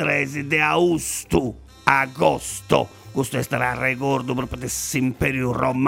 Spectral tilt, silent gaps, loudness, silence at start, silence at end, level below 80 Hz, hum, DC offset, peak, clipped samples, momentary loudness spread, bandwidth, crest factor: -4.5 dB/octave; none; -22 LUFS; 0 s; 0 s; -44 dBFS; none; under 0.1%; -2 dBFS; under 0.1%; 8 LU; 16.5 kHz; 20 dB